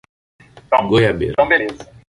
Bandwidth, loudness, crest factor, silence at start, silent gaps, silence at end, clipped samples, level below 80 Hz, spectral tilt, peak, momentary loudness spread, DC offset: 11.5 kHz; -16 LUFS; 16 dB; 0.7 s; none; 0.25 s; under 0.1%; -42 dBFS; -6.5 dB/octave; -2 dBFS; 10 LU; under 0.1%